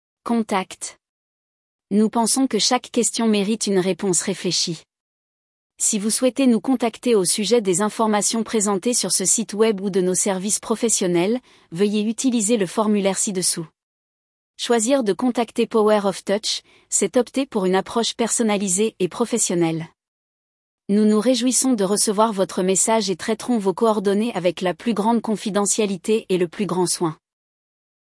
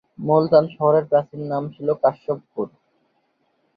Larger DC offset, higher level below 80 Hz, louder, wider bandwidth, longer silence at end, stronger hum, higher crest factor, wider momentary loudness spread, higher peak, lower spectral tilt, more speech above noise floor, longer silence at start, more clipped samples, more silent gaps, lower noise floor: neither; about the same, -66 dBFS vs -64 dBFS; about the same, -20 LUFS vs -20 LUFS; first, 12 kHz vs 5 kHz; about the same, 1 s vs 1.1 s; neither; about the same, 16 dB vs 18 dB; second, 6 LU vs 13 LU; about the same, -4 dBFS vs -2 dBFS; second, -3.5 dB/octave vs -10.5 dB/octave; first, over 70 dB vs 48 dB; about the same, 0.25 s vs 0.2 s; neither; first, 1.09-1.79 s, 5.00-5.70 s, 13.83-14.54 s, 20.08-20.78 s vs none; first, under -90 dBFS vs -67 dBFS